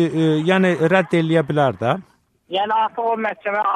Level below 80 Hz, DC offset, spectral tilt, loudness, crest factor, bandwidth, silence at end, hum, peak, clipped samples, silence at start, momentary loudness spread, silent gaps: -62 dBFS; under 0.1%; -7 dB/octave; -19 LUFS; 14 dB; 10 kHz; 0 s; none; -4 dBFS; under 0.1%; 0 s; 6 LU; none